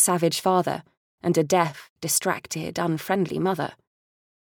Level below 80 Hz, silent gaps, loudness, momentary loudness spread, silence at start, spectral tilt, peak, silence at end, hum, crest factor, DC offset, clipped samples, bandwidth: -66 dBFS; 0.97-1.18 s, 1.90-1.96 s; -24 LUFS; 9 LU; 0 s; -4 dB/octave; -6 dBFS; 0.85 s; none; 18 dB; under 0.1%; under 0.1%; over 20 kHz